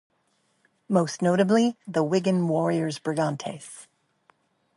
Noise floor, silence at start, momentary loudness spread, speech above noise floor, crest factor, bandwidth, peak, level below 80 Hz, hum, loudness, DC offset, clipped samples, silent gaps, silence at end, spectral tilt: -70 dBFS; 0.9 s; 15 LU; 46 dB; 20 dB; 11.5 kHz; -6 dBFS; -72 dBFS; none; -25 LUFS; under 0.1%; under 0.1%; none; 0.95 s; -6.5 dB/octave